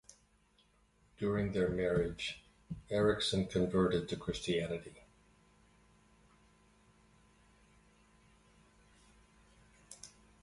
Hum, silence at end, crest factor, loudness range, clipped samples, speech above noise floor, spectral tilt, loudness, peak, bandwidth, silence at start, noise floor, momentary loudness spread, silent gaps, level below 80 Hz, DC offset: none; 0.35 s; 20 dB; 10 LU; under 0.1%; 36 dB; -5.5 dB/octave; -35 LUFS; -20 dBFS; 11.5 kHz; 1.2 s; -71 dBFS; 21 LU; none; -58 dBFS; under 0.1%